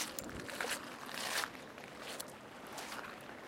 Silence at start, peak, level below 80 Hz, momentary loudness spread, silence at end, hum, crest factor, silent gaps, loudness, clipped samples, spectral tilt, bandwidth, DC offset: 0 s; -18 dBFS; -68 dBFS; 11 LU; 0 s; none; 26 dB; none; -43 LUFS; under 0.1%; -1.5 dB/octave; 16.5 kHz; under 0.1%